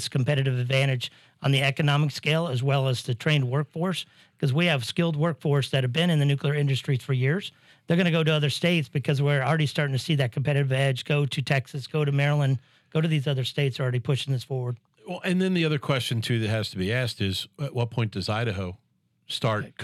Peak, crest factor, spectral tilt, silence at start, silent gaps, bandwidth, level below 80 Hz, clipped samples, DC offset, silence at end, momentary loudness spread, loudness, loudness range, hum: -8 dBFS; 16 dB; -6 dB/octave; 0 s; none; 13 kHz; -70 dBFS; under 0.1%; under 0.1%; 0 s; 8 LU; -25 LUFS; 3 LU; none